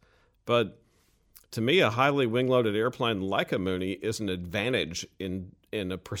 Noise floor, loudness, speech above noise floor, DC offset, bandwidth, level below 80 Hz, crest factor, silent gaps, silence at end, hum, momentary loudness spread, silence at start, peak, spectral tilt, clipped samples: -66 dBFS; -28 LUFS; 39 dB; under 0.1%; 17 kHz; -60 dBFS; 20 dB; none; 0 s; none; 12 LU; 0.45 s; -10 dBFS; -5 dB/octave; under 0.1%